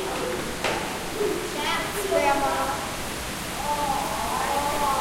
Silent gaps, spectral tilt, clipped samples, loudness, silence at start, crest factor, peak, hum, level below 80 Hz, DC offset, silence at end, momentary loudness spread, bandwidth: none; -3 dB/octave; under 0.1%; -26 LUFS; 0 s; 18 dB; -8 dBFS; none; -44 dBFS; under 0.1%; 0 s; 7 LU; 16 kHz